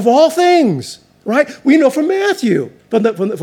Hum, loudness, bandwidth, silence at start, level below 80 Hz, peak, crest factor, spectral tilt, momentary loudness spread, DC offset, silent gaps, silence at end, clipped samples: none; -13 LUFS; 17 kHz; 0 s; -66 dBFS; 0 dBFS; 14 dB; -5.5 dB/octave; 8 LU; under 0.1%; none; 0 s; under 0.1%